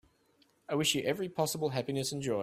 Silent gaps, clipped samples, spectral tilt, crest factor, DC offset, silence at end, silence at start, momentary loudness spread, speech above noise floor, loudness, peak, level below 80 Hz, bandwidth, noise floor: none; under 0.1%; -4 dB/octave; 20 dB; under 0.1%; 0 s; 0.7 s; 5 LU; 37 dB; -33 LUFS; -14 dBFS; -70 dBFS; 16 kHz; -69 dBFS